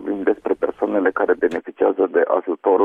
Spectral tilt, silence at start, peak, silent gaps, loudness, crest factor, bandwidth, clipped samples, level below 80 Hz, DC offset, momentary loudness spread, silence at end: -7.5 dB/octave; 0 s; -4 dBFS; none; -20 LUFS; 14 dB; 4.2 kHz; under 0.1%; -60 dBFS; under 0.1%; 4 LU; 0 s